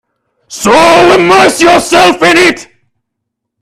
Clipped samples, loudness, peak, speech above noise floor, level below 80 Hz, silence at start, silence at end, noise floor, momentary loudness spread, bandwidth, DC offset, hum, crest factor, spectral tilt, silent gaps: 0.8%; -5 LUFS; 0 dBFS; 67 dB; -42 dBFS; 0.5 s; 0.95 s; -72 dBFS; 9 LU; 15 kHz; under 0.1%; none; 8 dB; -3 dB/octave; none